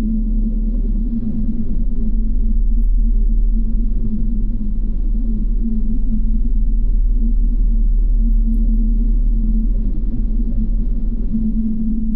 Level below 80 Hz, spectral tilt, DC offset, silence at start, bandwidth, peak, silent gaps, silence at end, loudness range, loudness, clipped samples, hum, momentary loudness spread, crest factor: -14 dBFS; -13 dB/octave; under 0.1%; 0 s; 0.8 kHz; -6 dBFS; none; 0 s; 2 LU; -21 LUFS; under 0.1%; none; 4 LU; 8 dB